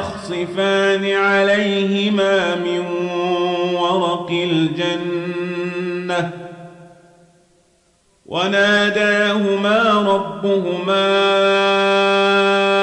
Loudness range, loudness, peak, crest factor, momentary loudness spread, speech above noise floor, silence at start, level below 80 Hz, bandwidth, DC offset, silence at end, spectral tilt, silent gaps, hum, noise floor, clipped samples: 8 LU; -17 LUFS; -6 dBFS; 12 dB; 9 LU; 42 dB; 0 s; -62 dBFS; 10.5 kHz; under 0.1%; 0 s; -5 dB/octave; none; none; -58 dBFS; under 0.1%